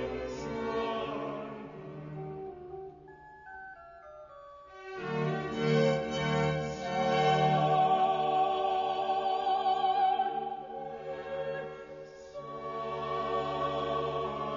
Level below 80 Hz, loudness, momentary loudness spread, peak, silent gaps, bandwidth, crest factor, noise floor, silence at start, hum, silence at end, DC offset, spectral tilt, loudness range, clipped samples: -60 dBFS; -31 LUFS; 21 LU; -14 dBFS; none; 7.2 kHz; 18 dB; -52 dBFS; 0 s; none; 0 s; under 0.1%; -4 dB/octave; 14 LU; under 0.1%